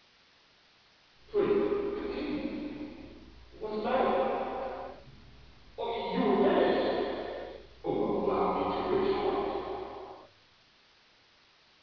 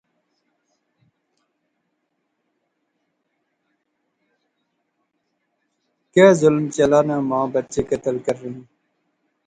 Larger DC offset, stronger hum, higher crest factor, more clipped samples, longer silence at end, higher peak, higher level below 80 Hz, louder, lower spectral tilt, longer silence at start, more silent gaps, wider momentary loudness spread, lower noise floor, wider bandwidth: first, 0.1% vs under 0.1%; neither; about the same, 18 dB vs 22 dB; neither; first, 1.55 s vs 0.85 s; second, -14 dBFS vs 0 dBFS; about the same, -58 dBFS vs -58 dBFS; second, -31 LUFS vs -18 LUFS; second, -4.5 dB/octave vs -6 dB/octave; second, 1.3 s vs 6.15 s; neither; first, 18 LU vs 14 LU; second, -63 dBFS vs -74 dBFS; second, 5.4 kHz vs 9.6 kHz